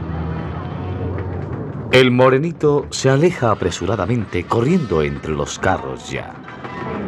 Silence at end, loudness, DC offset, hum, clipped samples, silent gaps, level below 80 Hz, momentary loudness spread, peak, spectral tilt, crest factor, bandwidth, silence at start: 0 s; -18 LUFS; under 0.1%; none; under 0.1%; none; -42 dBFS; 13 LU; -2 dBFS; -6 dB/octave; 18 dB; 12 kHz; 0 s